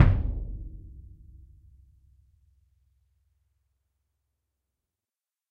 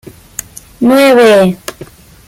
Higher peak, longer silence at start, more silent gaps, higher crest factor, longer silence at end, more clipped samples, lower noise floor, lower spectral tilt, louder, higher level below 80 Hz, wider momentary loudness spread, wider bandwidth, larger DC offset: about the same, -2 dBFS vs 0 dBFS; second, 0 s vs 0.8 s; neither; first, 28 dB vs 10 dB; first, 4.5 s vs 0.45 s; neither; first, under -90 dBFS vs -34 dBFS; first, -9.5 dB/octave vs -5 dB/octave; second, -30 LUFS vs -7 LUFS; first, -38 dBFS vs -46 dBFS; first, 26 LU vs 20 LU; second, 4.7 kHz vs 17 kHz; neither